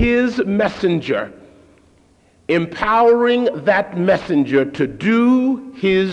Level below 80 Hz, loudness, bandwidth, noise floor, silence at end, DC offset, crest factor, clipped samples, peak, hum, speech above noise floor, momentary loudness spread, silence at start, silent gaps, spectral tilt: -42 dBFS; -17 LUFS; 9 kHz; -53 dBFS; 0 s; under 0.1%; 14 dB; under 0.1%; -4 dBFS; none; 37 dB; 7 LU; 0 s; none; -7 dB/octave